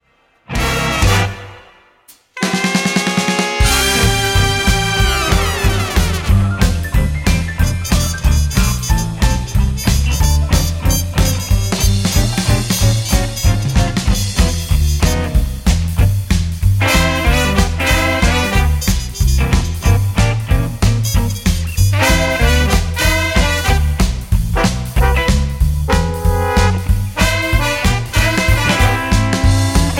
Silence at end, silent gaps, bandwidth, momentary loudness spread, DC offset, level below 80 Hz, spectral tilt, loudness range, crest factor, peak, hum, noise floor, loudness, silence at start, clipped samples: 0 s; none; 17 kHz; 4 LU; under 0.1%; -18 dBFS; -4.5 dB/octave; 2 LU; 14 dB; 0 dBFS; none; -47 dBFS; -15 LUFS; 0.5 s; under 0.1%